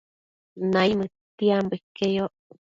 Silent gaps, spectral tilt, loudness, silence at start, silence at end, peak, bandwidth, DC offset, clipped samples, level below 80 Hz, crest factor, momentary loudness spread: 1.21-1.38 s, 1.83-1.95 s; -6.5 dB/octave; -25 LUFS; 0.55 s; 0.35 s; -8 dBFS; 7.6 kHz; under 0.1%; under 0.1%; -62 dBFS; 18 dB; 9 LU